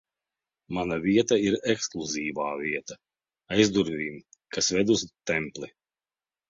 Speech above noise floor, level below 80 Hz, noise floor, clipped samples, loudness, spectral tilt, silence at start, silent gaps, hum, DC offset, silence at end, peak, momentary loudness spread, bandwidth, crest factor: over 64 dB; -58 dBFS; under -90 dBFS; under 0.1%; -27 LUFS; -4 dB/octave; 0.7 s; none; none; under 0.1%; 0.8 s; -6 dBFS; 14 LU; 7.8 kHz; 22 dB